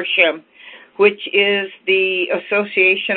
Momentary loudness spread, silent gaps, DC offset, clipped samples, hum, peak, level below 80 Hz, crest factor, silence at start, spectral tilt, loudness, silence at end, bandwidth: 6 LU; none; under 0.1%; under 0.1%; none; 0 dBFS; -66 dBFS; 18 dB; 0 s; -7.5 dB/octave; -16 LUFS; 0 s; 4.4 kHz